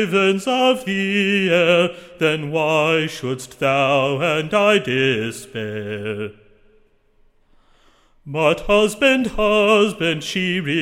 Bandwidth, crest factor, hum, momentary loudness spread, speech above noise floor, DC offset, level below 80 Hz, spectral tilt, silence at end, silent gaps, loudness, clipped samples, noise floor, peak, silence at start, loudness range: 16.5 kHz; 18 dB; none; 12 LU; 38 dB; under 0.1%; -44 dBFS; -5 dB/octave; 0 s; none; -18 LUFS; under 0.1%; -56 dBFS; -2 dBFS; 0 s; 8 LU